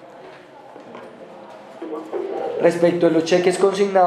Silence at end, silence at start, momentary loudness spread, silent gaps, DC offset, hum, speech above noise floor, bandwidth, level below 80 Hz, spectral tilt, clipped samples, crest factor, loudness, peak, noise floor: 0 s; 0 s; 24 LU; none; under 0.1%; none; 24 dB; 12.5 kHz; -76 dBFS; -5.5 dB/octave; under 0.1%; 18 dB; -19 LUFS; -2 dBFS; -42 dBFS